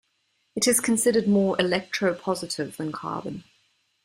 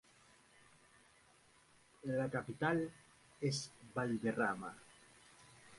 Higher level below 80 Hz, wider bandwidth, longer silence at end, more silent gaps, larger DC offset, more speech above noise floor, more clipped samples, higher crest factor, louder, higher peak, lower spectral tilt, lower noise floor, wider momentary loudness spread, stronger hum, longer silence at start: first, -64 dBFS vs -74 dBFS; first, 16 kHz vs 11.5 kHz; first, 0.65 s vs 0 s; neither; neither; first, 47 dB vs 29 dB; neither; about the same, 18 dB vs 22 dB; first, -24 LUFS vs -40 LUFS; first, -8 dBFS vs -22 dBFS; second, -3.5 dB/octave vs -5.5 dB/octave; about the same, -71 dBFS vs -68 dBFS; second, 13 LU vs 24 LU; neither; second, 0.55 s vs 2.05 s